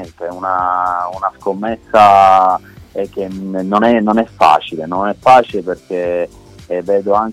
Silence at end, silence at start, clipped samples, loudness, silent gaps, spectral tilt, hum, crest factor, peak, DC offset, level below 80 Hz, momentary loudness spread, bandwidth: 0 s; 0 s; under 0.1%; -13 LUFS; none; -6 dB/octave; none; 14 dB; 0 dBFS; under 0.1%; -48 dBFS; 14 LU; 12.5 kHz